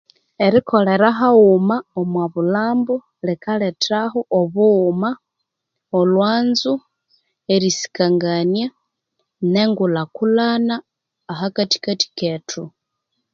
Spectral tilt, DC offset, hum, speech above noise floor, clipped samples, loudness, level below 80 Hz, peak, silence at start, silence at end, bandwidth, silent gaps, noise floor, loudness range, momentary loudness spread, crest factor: -5.5 dB/octave; under 0.1%; none; 62 dB; under 0.1%; -18 LUFS; -64 dBFS; 0 dBFS; 0.4 s; 0.65 s; 7.6 kHz; none; -79 dBFS; 4 LU; 11 LU; 18 dB